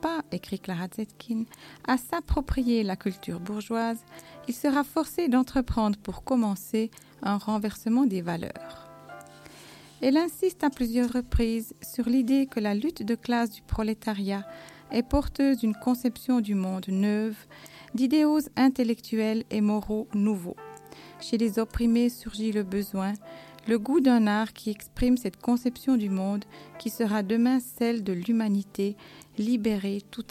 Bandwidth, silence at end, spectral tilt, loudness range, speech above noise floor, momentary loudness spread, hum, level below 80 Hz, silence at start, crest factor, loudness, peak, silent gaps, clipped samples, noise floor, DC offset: 16 kHz; 0.1 s; -6 dB/octave; 3 LU; 22 dB; 15 LU; none; -44 dBFS; 0.05 s; 18 dB; -27 LUFS; -10 dBFS; none; under 0.1%; -49 dBFS; under 0.1%